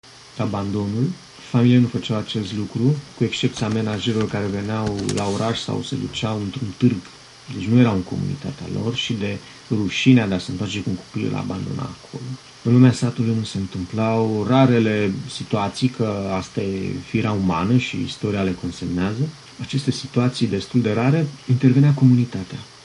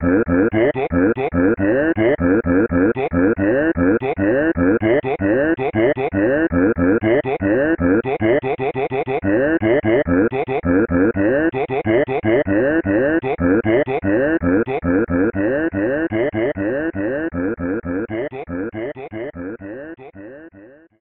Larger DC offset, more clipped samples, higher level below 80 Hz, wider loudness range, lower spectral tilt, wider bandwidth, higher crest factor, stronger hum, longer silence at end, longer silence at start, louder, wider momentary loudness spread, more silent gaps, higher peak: neither; neither; second, -48 dBFS vs -40 dBFS; about the same, 4 LU vs 6 LU; second, -6.5 dB/octave vs -12 dB/octave; first, 11.5 kHz vs 4 kHz; about the same, 18 dB vs 14 dB; neither; second, 0.15 s vs 0.35 s; about the same, 0.05 s vs 0 s; second, -21 LUFS vs -18 LUFS; about the same, 12 LU vs 10 LU; neither; about the same, -4 dBFS vs -4 dBFS